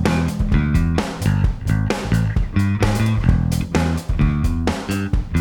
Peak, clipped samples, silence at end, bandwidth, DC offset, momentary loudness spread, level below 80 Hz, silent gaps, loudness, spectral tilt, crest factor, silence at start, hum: -2 dBFS; under 0.1%; 0 s; 18.5 kHz; under 0.1%; 4 LU; -24 dBFS; none; -20 LUFS; -6.5 dB/octave; 16 dB; 0 s; none